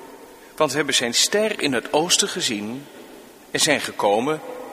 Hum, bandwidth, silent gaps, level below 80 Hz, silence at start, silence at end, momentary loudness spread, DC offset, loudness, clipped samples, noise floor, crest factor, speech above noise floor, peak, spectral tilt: none; 15.5 kHz; none; -64 dBFS; 0 s; 0 s; 11 LU; under 0.1%; -20 LUFS; under 0.1%; -44 dBFS; 22 dB; 22 dB; -2 dBFS; -2 dB/octave